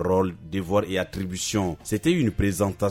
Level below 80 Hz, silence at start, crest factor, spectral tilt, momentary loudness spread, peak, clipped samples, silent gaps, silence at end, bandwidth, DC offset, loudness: -42 dBFS; 0 s; 16 dB; -5.5 dB/octave; 6 LU; -8 dBFS; under 0.1%; none; 0 s; 16 kHz; under 0.1%; -25 LUFS